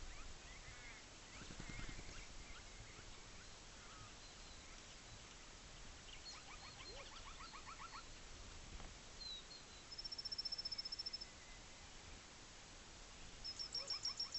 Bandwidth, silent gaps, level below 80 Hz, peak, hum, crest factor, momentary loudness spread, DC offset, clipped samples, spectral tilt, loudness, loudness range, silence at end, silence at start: 8.2 kHz; none; -60 dBFS; -32 dBFS; none; 20 dB; 13 LU; under 0.1%; under 0.1%; -1.5 dB/octave; -51 LUFS; 8 LU; 0 s; 0 s